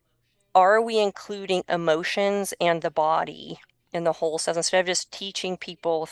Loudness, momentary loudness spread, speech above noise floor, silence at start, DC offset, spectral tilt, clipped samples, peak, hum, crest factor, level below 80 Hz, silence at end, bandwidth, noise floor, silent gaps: -24 LUFS; 13 LU; 46 dB; 0.55 s; under 0.1%; -3 dB/octave; under 0.1%; -4 dBFS; none; 20 dB; -68 dBFS; 0 s; 12.5 kHz; -70 dBFS; none